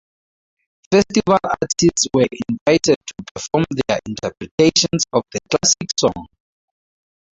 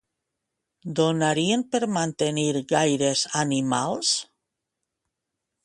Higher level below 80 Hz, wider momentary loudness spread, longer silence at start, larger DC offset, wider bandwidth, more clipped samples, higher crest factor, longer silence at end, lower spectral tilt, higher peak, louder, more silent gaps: first, -48 dBFS vs -66 dBFS; first, 9 LU vs 4 LU; about the same, 0.9 s vs 0.85 s; neither; second, 8.4 kHz vs 11.5 kHz; neither; about the same, 18 dB vs 20 dB; second, 1.1 s vs 1.4 s; about the same, -3.5 dB/octave vs -4 dB/octave; first, -2 dBFS vs -6 dBFS; first, -17 LUFS vs -24 LUFS; first, 2.61-2.66 s, 2.96-3.01 s, 3.31-3.35 s, 4.51-4.58 s vs none